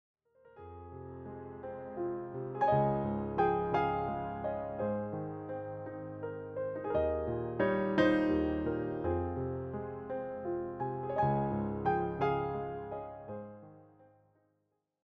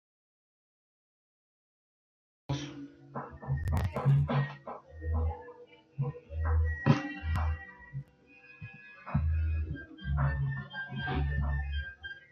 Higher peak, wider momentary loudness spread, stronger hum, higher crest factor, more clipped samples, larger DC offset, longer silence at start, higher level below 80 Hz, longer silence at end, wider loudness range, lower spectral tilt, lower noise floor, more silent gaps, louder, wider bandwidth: second, -16 dBFS vs -10 dBFS; second, 15 LU vs 19 LU; neither; about the same, 20 dB vs 24 dB; neither; neither; second, 0.45 s vs 2.5 s; second, -56 dBFS vs -42 dBFS; first, 1.2 s vs 0.15 s; about the same, 5 LU vs 6 LU; first, -9 dB/octave vs -7.5 dB/octave; first, -80 dBFS vs -58 dBFS; neither; about the same, -35 LUFS vs -34 LUFS; about the same, 6.4 kHz vs 6.8 kHz